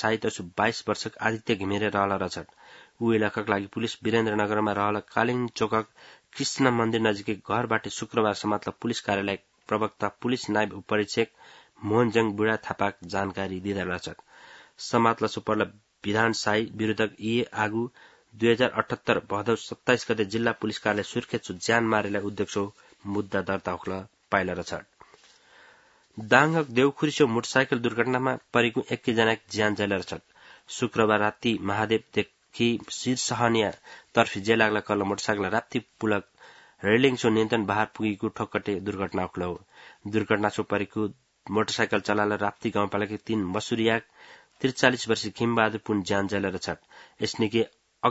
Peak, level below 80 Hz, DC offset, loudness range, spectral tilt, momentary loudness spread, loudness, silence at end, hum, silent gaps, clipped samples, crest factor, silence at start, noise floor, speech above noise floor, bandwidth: -2 dBFS; -64 dBFS; under 0.1%; 3 LU; -5 dB/octave; 9 LU; -27 LUFS; 0 s; none; none; under 0.1%; 26 dB; 0 s; -58 dBFS; 32 dB; 8 kHz